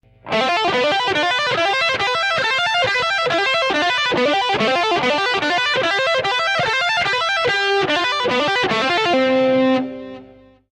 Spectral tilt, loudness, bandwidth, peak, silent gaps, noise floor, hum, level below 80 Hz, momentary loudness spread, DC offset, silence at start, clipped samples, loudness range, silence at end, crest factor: -3 dB/octave; -17 LUFS; 11.5 kHz; -8 dBFS; none; -45 dBFS; none; -54 dBFS; 2 LU; under 0.1%; 0.25 s; under 0.1%; 0 LU; 0.45 s; 10 dB